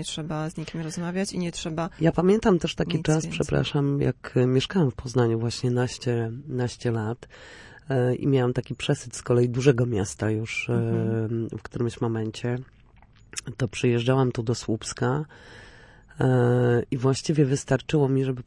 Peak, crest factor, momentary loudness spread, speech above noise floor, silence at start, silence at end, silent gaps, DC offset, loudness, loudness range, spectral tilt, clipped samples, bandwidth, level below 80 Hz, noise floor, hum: -6 dBFS; 18 dB; 9 LU; 29 dB; 0 s; 0.05 s; none; under 0.1%; -25 LUFS; 4 LU; -6.5 dB/octave; under 0.1%; 11.5 kHz; -50 dBFS; -54 dBFS; none